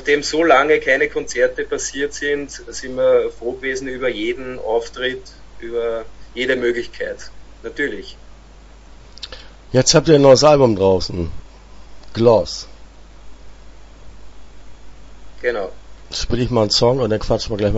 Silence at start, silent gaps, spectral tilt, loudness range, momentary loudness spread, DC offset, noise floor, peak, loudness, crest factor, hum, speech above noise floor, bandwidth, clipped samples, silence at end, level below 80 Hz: 0 s; none; -4.5 dB/octave; 11 LU; 19 LU; under 0.1%; -42 dBFS; 0 dBFS; -17 LUFS; 18 dB; none; 25 dB; 8 kHz; under 0.1%; 0 s; -38 dBFS